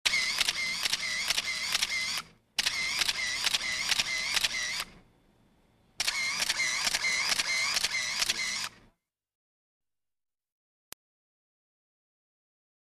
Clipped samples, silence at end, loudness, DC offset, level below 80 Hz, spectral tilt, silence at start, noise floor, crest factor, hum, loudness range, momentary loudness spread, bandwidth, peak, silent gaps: under 0.1%; 4.25 s; -28 LUFS; under 0.1%; -60 dBFS; 1.5 dB/octave; 0.05 s; -69 dBFS; 22 dB; none; 5 LU; 6 LU; 14 kHz; -10 dBFS; none